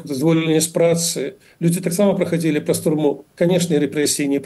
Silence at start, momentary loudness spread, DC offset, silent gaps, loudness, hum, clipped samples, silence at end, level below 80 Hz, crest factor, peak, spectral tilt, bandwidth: 0 s; 5 LU; under 0.1%; none; -18 LUFS; none; under 0.1%; 0 s; -62 dBFS; 12 dB; -6 dBFS; -5 dB/octave; 12.5 kHz